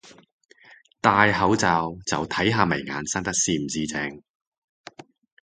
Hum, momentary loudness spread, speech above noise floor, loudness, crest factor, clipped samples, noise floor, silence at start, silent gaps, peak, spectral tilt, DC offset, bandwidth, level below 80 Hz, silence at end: none; 9 LU; 31 dB; -23 LUFS; 24 dB; under 0.1%; -54 dBFS; 0.05 s; 0.32-0.39 s; 0 dBFS; -3.5 dB/octave; under 0.1%; 9.6 kHz; -52 dBFS; 1.25 s